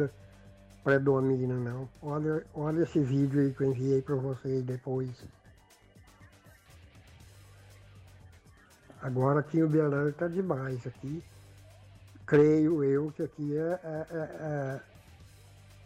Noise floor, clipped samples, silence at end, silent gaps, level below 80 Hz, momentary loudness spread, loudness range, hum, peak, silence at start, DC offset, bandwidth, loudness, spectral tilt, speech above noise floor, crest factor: -59 dBFS; under 0.1%; 0.6 s; none; -62 dBFS; 13 LU; 8 LU; none; -14 dBFS; 0 s; under 0.1%; 11 kHz; -30 LUFS; -9 dB/octave; 30 dB; 16 dB